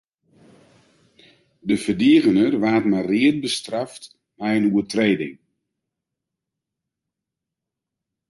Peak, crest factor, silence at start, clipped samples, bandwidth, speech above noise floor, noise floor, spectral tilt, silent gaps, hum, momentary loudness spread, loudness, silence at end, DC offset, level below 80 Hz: -4 dBFS; 18 dB; 1.65 s; under 0.1%; 11.5 kHz; 66 dB; -84 dBFS; -5.5 dB/octave; none; none; 14 LU; -20 LUFS; 2.95 s; under 0.1%; -60 dBFS